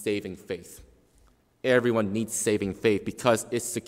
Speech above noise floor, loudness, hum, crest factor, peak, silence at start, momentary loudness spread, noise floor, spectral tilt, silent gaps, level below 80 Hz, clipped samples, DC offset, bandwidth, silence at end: 35 dB; -27 LUFS; none; 20 dB; -8 dBFS; 0 s; 14 LU; -62 dBFS; -4.5 dB/octave; none; -60 dBFS; under 0.1%; under 0.1%; 16 kHz; 0 s